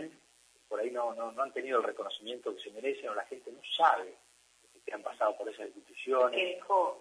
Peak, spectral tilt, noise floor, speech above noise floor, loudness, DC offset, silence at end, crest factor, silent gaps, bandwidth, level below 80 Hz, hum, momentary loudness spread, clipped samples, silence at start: -12 dBFS; -2.5 dB/octave; -65 dBFS; 32 dB; -33 LUFS; under 0.1%; 0 s; 24 dB; none; 11 kHz; -86 dBFS; none; 17 LU; under 0.1%; 0 s